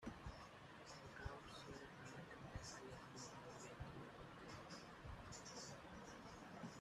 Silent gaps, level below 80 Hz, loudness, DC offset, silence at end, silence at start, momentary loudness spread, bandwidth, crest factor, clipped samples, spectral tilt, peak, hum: none; -68 dBFS; -57 LUFS; under 0.1%; 0 s; 0 s; 4 LU; 13.5 kHz; 20 dB; under 0.1%; -4 dB/octave; -36 dBFS; none